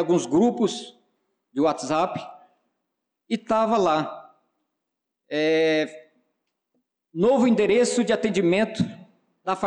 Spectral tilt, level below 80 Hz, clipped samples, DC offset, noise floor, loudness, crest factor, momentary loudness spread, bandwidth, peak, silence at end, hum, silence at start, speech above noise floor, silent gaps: -5 dB/octave; -64 dBFS; under 0.1%; under 0.1%; -83 dBFS; -22 LUFS; 12 dB; 15 LU; 10.5 kHz; -12 dBFS; 0 s; none; 0 s; 61 dB; none